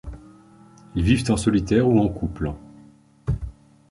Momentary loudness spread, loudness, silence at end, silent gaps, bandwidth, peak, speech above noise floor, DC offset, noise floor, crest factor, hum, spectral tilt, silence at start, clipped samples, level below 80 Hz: 17 LU; -22 LUFS; 0.4 s; none; 11.5 kHz; -4 dBFS; 31 dB; under 0.1%; -51 dBFS; 20 dB; none; -6.5 dB/octave; 0.05 s; under 0.1%; -36 dBFS